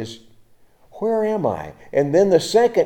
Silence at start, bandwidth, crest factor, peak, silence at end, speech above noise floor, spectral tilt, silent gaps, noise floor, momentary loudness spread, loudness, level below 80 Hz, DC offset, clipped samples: 0 s; 17 kHz; 18 dB; -2 dBFS; 0 s; 34 dB; -5.5 dB/octave; none; -52 dBFS; 12 LU; -19 LUFS; -58 dBFS; under 0.1%; under 0.1%